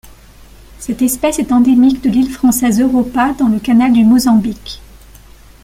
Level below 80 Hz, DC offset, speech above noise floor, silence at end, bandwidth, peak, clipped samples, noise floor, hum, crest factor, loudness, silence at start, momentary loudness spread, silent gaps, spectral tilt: -38 dBFS; under 0.1%; 28 dB; 0.9 s; 16 kHz; -2 dBFS; under 0.1%; -39 dBFS; none; 10 dB; -12 LUFS; 0.8 s; 14 LU; none; -5 dB/octave